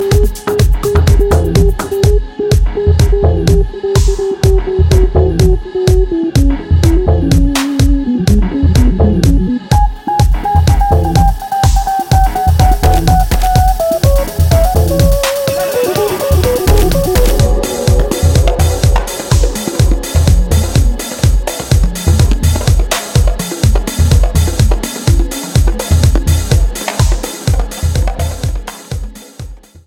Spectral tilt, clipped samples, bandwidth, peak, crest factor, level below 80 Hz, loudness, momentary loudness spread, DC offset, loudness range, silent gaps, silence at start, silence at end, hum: -6 dB/octave; under 0.1%; 17 kHz; 0 dBFS; 10 dB; -14 dBFS; -12 LUFS; 5 LU; under 0.1%; 2 LU; none; 0 s; 0.3 s; none